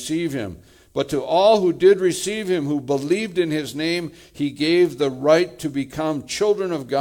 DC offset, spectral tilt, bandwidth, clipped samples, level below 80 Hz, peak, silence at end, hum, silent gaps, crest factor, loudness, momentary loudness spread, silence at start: under 0.1%; -5 dB/octave; 17.5 kHz; under 0.1%; -56 dBFS; -4 dBFS; 0 s; none; none; 16 dB; -21 LUFS; 11 LU; 0 s